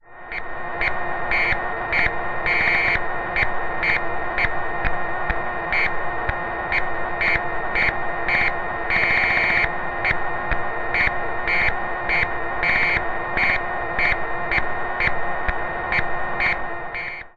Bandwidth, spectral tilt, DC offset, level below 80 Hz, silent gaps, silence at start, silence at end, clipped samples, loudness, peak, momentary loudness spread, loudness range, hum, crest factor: 7 kHz; -5.5 dB/octave; under 0.1%; -36 dBFS; none; 0.1 s; 0.05 s; under 0.1%; -21 LUFS; -4 dBFS; 8 LU; 3 LU; none; 18 dB